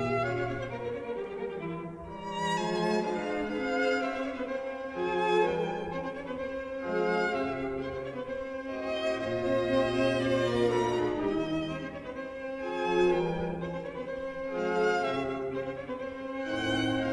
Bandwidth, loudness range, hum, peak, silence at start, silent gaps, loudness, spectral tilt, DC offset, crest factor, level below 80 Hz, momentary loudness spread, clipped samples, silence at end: 11 kHz; 4 LU; none; -14 dBFS; 0 s; none; -31 LUFS; -6 dB/octave; under 0.1%; 16 dB; -56 dBFS; 10 LU; under 0.1%; 0 s